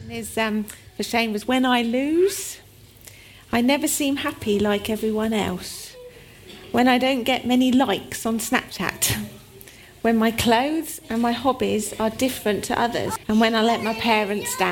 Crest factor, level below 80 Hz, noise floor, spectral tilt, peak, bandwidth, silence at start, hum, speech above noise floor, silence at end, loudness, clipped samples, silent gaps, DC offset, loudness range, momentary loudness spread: 18 dB; -50 dBFS; -46 dBFS; -3.5 dB/octave; -4 dBFS; 18 kHz; 0 s; none; 25 dB; 0 s; -22 LUFS; under 0.1%; none; under 0.1%; 2 LU; 10 LU